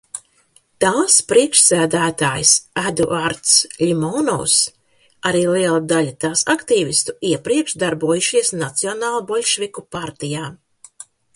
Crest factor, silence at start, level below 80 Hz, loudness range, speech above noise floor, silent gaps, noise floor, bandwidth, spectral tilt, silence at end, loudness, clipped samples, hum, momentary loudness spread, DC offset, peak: 18 dB; 0.15 s; -56 dBFS; 5 LU; 39 dB; none; -57 dBFS; 11.5 kHz; -2.5 dB/octave; 0.8 s; -16 LUFS; under 0.1%; none; 13 LU; under 0.1%; 0 dBFS